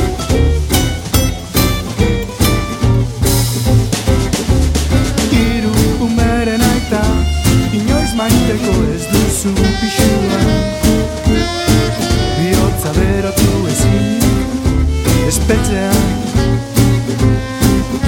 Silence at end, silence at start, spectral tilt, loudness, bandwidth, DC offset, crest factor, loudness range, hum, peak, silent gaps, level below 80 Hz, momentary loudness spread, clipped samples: 0 s; 0 s; -5.5 dB/octave; -14 LUFS; 17 kHz; under 0.1%; 12 dB; 1 LU; none; 0 dBFS; none; -20 dBFS; 2 LU; under 0.1%